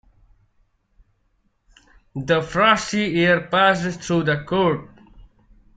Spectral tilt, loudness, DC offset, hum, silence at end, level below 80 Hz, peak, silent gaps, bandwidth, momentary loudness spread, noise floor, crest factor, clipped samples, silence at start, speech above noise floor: -5 dB/octave; -19 LUFS; under 0.1%; none; 0.55 s; -50 dBFS; -2 dBFS; none; 9.2 kHz; 7 LU; -66 dBFS; 20 dB; under 0.1%; 2.15 s; 47 dB